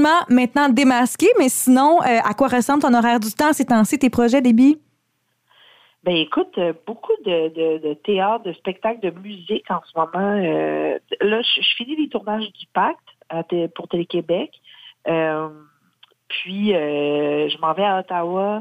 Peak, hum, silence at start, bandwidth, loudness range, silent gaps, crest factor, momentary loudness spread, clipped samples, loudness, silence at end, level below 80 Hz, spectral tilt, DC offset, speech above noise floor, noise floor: -4 dBFS; none; 0 s; 16 kHz; 8 LU; none; 14 dB; 12 LU; under 0.1%; -19 LUFS; 0 s; -62 dBFS; -4 dB/octave; under 0.1%; 51 dB; -69 dBFS